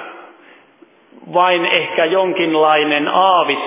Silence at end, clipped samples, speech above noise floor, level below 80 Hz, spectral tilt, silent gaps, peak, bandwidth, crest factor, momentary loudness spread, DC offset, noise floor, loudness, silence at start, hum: 0 s; under 0.1%; 35 dB; -80 dBFS; -7.5 dB/octave; none; 0 dBFS; 3.9 kHz; 16 dB; 3 LU; under 0.1%; -49 dBFS; -14 LUFS; 0 s; none